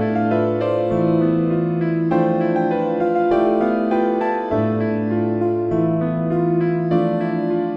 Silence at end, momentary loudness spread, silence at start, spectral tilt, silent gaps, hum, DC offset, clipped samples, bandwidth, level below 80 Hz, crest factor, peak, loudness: 0 s; 3 LU; 0 s; -10.5 dB/octave; none; none; under 0.1%; under 0.1%; 5.4 kHz; -50 dBFS; 12 dB; -6 dBFS; -19 LUFS